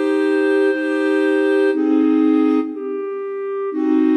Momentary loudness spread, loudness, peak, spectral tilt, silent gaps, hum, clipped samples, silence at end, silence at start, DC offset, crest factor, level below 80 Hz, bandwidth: 10 LU; -18 LUFS; -6 dBFS; -5 dB/octave; none; none; under 0.1%; 0 s; 0 s; under 0.1%; 10 dB; -78 dBFS; 9.2 kHz